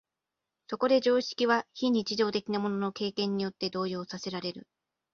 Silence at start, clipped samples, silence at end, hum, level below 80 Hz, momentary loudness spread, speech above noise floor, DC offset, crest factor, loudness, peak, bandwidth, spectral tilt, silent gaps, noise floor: 0.7 s; under 0.1%; 0.55 s; none; -72 dBFS; 11 LU; 58 dB; under 0.1%; 20 dB; -30 LUFS; -10 dBFS; 7.2 kHz; -5 dB/octave; none; -88 dBFS